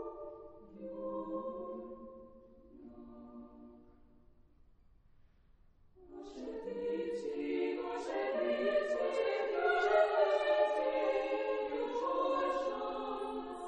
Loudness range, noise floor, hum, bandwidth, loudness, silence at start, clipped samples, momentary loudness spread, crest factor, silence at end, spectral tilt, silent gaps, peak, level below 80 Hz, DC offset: 18 LU; -65 dBFS; none; 9.4 kHz; -35 LUFS; 0 s; under 0.1%; 23 LU; 20 dB; 0 s; -4.5 dB/octave; none; -18 dBFS; -66 dBFS; under 0.1%